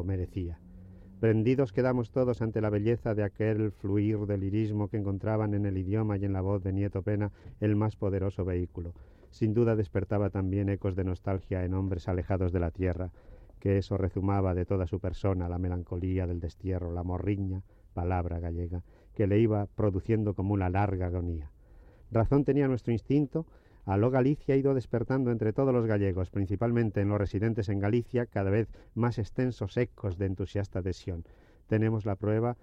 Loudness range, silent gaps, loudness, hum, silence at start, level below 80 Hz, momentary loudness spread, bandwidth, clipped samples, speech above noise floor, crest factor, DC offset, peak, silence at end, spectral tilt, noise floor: 4 LU; none; -30 LUFS; none; 0 s; -48 dBFS; 8 LU; 6.8 kHz; under 0.1%; 25 dB; 14 dB; under 0.1%; -14 dBFS; 0.1 s; -10 dB/octave; -54 dBFS